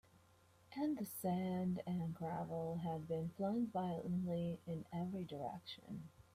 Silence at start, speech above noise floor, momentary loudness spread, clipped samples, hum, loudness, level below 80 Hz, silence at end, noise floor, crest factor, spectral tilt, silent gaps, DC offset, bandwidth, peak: 0.15 s; 27 dB; 9 LU; under 0.1%; none; -43 LUFS; -74 dBFS; 0.15 s; -70 dBFS; 14 dB; -7.5 dB/octave; none; under 0.1%; 15 kHz; -30 dBFS